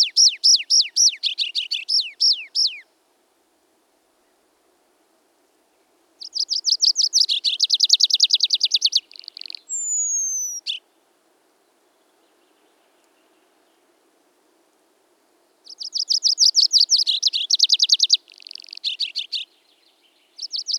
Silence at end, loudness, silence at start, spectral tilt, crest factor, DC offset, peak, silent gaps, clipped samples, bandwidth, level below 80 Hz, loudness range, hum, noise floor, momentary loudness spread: 0 s; -17 LUFS; 0 s; 7.5 dB/octave; 20 dB; under 0.1%; -2 dBFS; none; under 0.1%; 18 kHz; under -90 dBFS; 13 LU; none; -64 dBFS; 18 LU